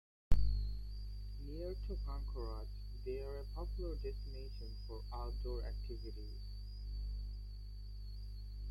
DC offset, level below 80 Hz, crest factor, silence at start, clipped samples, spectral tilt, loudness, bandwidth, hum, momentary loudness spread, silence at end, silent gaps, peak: under 0.1%; -42 dBFS; 24 dB; 0.3 s; under 0.1%; -7.5 dB/octave; -46 LUFS; 12 kHz; 50 Hz at -45 dBFS; 9 LU; 0 s; none; -16 dBFS